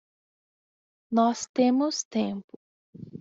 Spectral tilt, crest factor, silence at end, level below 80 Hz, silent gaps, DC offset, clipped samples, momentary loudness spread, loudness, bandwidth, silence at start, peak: -4.5 dB/octave; 18 dB; 0 s; -74 dBFS; 1.49-1.54 s, 2.05-2.11 s, 2.44-2.48 s, 2.56-2.93 s; under 0.1%; under 0.1%; 12 LU; -26 LUFS; 7.8 kHz; 1.1 s; -10 dBFS